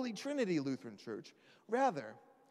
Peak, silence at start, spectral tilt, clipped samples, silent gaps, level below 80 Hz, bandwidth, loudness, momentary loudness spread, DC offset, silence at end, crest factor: -22 dBFS; 0 s; -5.5 dB/octave; under 0.1%; none; under -90 dBFS; 13 kHz; -38 LUFS; 14 LU; under 0.1%; 0.3 s; 18 dB